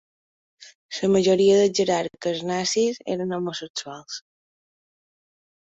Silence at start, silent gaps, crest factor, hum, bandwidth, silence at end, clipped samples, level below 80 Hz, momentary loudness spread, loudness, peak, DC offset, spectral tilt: 0.6 s; 0.75-0.89 s, 3.70-3.74 s; 16 dB; none; 8 kHz; 1.6 s; under 0.1%; -66 dBFS; 17 LU; -22 LUFS; -8 dBFS; under 0.1%; -4.5 dB/octave